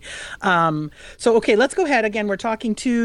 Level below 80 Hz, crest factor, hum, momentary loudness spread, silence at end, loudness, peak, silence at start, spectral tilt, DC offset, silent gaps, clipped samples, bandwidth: -50 dBFS; 16 dB; none; 9 LU; 0 s; -19 LUFS; -4 dBFS; 0.05 s; -5 dB/octave; under 0.1%; none; under 0.1%; 11.5 kHz